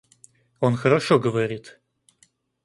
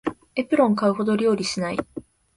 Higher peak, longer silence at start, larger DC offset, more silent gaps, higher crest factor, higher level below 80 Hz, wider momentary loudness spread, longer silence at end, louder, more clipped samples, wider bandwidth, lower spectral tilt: about the same, -6 dBFS vs -6 dBFS; first, 0.6 s vs 0.05 s; neither; neither; about the same, 18 dB vs 16 dB; about the same, -62 dBFS vs -58 dBFS; second, 9 LU vs 12 LU; first, 0.95 s vs 0.35 s; about the same, -22 LUFS vs -22 LUFS; neither; about the same, 11.5 kHz vs 11.5 kHz; about the same, -6.5 dB/octave vs -5.5 dB/octave